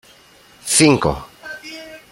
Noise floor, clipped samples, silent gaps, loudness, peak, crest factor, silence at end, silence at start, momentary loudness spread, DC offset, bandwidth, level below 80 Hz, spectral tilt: -48 dBFS; under 0.1%; none; -15 LUFS; 0 dBFS; 20 dB; 0.15 s; 0.65 s; 21 LU; under 0.1%; 16.5 kHz; -42 dBFS; -3.5 dB/octave